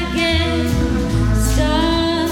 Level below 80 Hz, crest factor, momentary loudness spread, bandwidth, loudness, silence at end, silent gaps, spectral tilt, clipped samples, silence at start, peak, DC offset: -22 dBFS; 12 dB; 2 LU; 17 kHz; -17 LUFS; 0 s; none; -5.5 dB/octave; under 0.1%; 0 s; -4 dBFS; under 0.1%